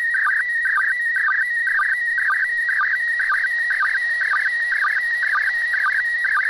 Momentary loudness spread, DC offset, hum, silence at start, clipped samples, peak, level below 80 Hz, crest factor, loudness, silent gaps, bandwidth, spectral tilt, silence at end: 1 LU; under 0.1%; none; 0 s; under 0.1%; -12 dBFS; -62 dBFS; 8 dB; -18 LUFS; none; 12.5 kHz; 1.5 dB/octave; 0 s